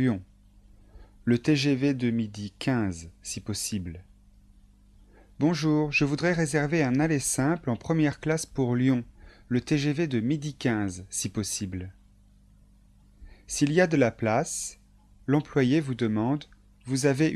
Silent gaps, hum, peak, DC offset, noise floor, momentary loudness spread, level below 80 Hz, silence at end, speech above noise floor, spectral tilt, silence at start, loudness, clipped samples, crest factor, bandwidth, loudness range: none; 50 Hz at -55 dBFS; -8 dBFS; under 0.1%; -57 dBFS; 11 LU; -54 dBFS; 0 s; 31 dB; -5.5 dB/octave; 0 s; -27 LUFS; under 0.1%; 18 dB; 13 kHz; 6 LU